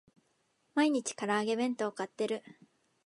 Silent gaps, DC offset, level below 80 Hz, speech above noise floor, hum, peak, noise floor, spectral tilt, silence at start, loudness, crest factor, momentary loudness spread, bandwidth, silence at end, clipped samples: none; under 0.1%; -86 dBFS; 43 dB; none; -16 dBFS; -75 dBFS; -4 dB/octave; 0.75 s; -33 LUFS; 18 dB; 7 LU; 11.5 kHz; 0.65 s; under 0.1%